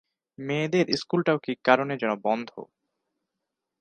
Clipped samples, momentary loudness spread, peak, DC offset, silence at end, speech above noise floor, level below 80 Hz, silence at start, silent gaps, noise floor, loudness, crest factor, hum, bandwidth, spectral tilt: under 0.1%; 13 LU; -2 dBFS; under 0.1%; 1.15 s; 59 dB; -72 dBFS; 0.4 s; none; -84 dBFS; -25 LUFS; 24 dB; none; 9.4 kHz; -6 dB/octave